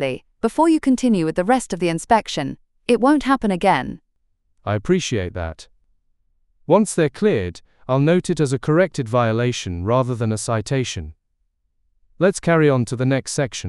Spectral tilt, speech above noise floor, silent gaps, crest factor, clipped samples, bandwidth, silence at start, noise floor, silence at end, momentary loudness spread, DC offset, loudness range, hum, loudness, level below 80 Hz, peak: -6 dB/octave; 50 dB; none; 18 dB; under 0.1%; 12 kHz; 0 s; -69 dBFS; 0 s; 11 LU; under 0.1%; 4 LU; none; -19 LUFS; -46 dBFS; -2 dBFS